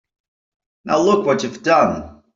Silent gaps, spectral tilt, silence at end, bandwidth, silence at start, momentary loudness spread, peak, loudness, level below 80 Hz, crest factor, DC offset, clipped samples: none; -5 dB/octave; 0.25 s; 7.8 kHz; 0.85 s; 5 LU; -2 dBFS; -17 LUFS; -54 dBFS; 16 dB; under 0.1%; under 0.1%